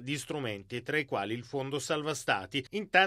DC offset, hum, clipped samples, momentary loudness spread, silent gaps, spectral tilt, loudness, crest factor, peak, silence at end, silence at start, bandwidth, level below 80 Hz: under 0.1%; none; under 0.1%; 5 LU; none; -3.5 dB/octave; -33 LUFS; 22 dB; -10 dBFS; 0 s; 0 s; 15.5 kHz; -68 dBFS